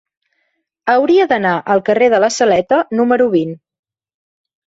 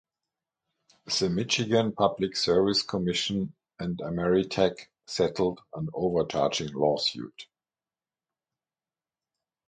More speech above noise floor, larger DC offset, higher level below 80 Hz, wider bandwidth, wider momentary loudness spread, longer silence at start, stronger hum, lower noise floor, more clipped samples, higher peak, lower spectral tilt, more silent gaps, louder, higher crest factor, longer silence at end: second, 55 dB vs over 63 dB; neither; about the same, -58 dBFS vs -58 dBFS; second, 8 kHz vs 9.4 kHz; second, 4 LU vs 12 LU; second, 0.85 s vs 1.05 s; neither; second, -68 dBFS vs under -90 dBFS; neither; first, 0 dBFS vs -10 dBFS; about the same, -5 dB/octave vs -4.5 dB/octave; neither; first, -13 LUFS vs -27 LUFS; second, 14 dB vs 20 dB; second, 1.1 s vs 2.25 s